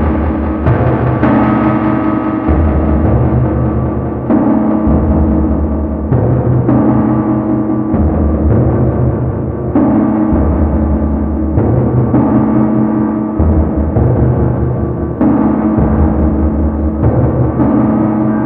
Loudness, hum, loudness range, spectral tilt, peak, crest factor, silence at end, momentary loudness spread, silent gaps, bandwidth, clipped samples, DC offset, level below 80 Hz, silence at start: -12 LUFS; none; 1 LU; -13 dB/octave; 0 dBFS; 10 dB; 0 s; 4 LU; none; 3.6 kHz; under 0.1%; under 0.1%; -20 dBFS; 0 s